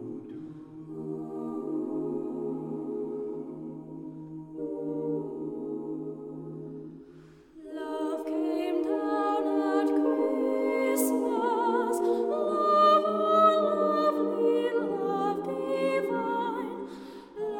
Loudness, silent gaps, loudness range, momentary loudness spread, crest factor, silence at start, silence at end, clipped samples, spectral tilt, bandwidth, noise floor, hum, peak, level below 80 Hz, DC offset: -28 LUFS; none; 12 LU; 17 LU; 20 dB; 0 s; 0 s; under 0.1%; -5.5 dB/octave; 18 kHz; -52 dBFS; none; -10 dBFS; -72 dBFS; under 0.1%